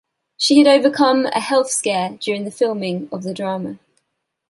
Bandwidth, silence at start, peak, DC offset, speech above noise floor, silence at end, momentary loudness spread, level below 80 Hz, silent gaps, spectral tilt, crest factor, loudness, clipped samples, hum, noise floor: 11.5 kHz; 0.4 s; -2 dBFS; under 0.1%; 57 dB; 0.75 s; 13 LU; -66 dBFS; none; -4 dB/octave; 16 dB; -17 LUFS; under 0.1%; none; -74 dBFS